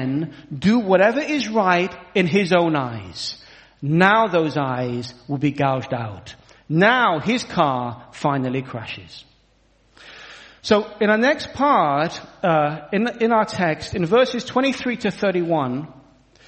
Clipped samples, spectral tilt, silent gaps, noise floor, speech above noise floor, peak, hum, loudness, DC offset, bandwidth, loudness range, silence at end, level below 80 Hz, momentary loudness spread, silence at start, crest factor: under 0.1%; -6 dB/octave; none; -59 dBFS; 39 dB; 0 dBFS; none; -20 LUFS; under 0.1%; 8.8 kHz; 4 LU; 0.55 s; -54 dBFS; 14 LU; 0 s; 20 dB